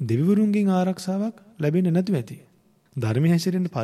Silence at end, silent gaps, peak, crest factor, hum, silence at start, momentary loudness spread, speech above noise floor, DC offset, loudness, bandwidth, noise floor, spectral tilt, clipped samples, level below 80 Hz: 0 s; none; -10 dBFS; 12 dB; none; 0 s; 10 LU; 30 dB; under 0.1%; -23 LUFS; 13 kHz; -52 dBFS; -7.5 dB/octave; under 0.1%; -66 dBFS